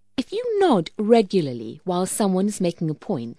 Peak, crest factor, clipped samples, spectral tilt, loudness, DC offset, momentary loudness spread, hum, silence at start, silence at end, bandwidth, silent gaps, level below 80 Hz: -4 dBFS; 18 dB; under 0.1%; -6 dB/octave; -22 LUFS; 0.2%; 10 LU; none; 0.2 s; 0.05 s; 11 kHz; none; -60 dBFS